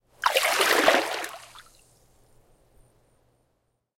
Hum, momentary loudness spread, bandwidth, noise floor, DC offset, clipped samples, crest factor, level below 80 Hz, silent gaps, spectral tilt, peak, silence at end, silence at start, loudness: none; 17 LU; 17 kHz; -73 dBFS; under 0.1%; under 0.1%; 24 dB; -64 dBFS; none; -0.5 dB/octave; -4 dBFS; 2.4 s; 0.2 s; -22 LUFS